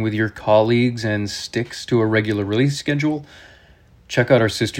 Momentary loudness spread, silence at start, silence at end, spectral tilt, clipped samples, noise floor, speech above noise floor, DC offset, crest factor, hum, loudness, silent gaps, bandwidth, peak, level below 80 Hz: 9 LU; 0 s; 0 s; -6 dB/octave; under 0.1%; -50 dBFS; 31 dB; under 0.1%; 18 dB; none; -19 LUFS; none; 16 kHz; 0 dBFS; -52 dBFS